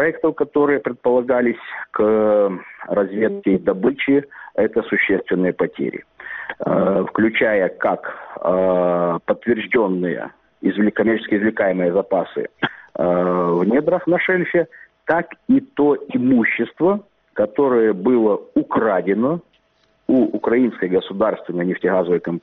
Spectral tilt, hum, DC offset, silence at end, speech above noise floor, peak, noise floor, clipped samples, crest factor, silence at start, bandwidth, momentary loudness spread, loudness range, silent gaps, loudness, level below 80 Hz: -5.5 dB/octave; none; under 0.1%; 0.05 s; 43 dB; -4 dBFS; -61 dBFS; under 0.1%; 16 dB; 0 s; 4.1 kHz; 9 LU; 2 LU; none; -19 LUFS; -58 dBFS